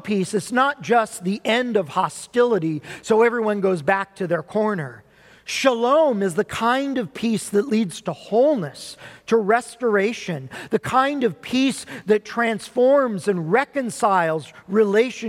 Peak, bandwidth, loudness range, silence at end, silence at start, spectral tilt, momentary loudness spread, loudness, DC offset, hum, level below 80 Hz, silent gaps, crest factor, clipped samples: -4 dBFS; 15 kHz; 2 LU; 0 s; 0.05 s; -5 dB/octave; 10 LU; -21 LUFS; under 0.1%; none; -62 dBFS; none; 16 dB; under 0.1%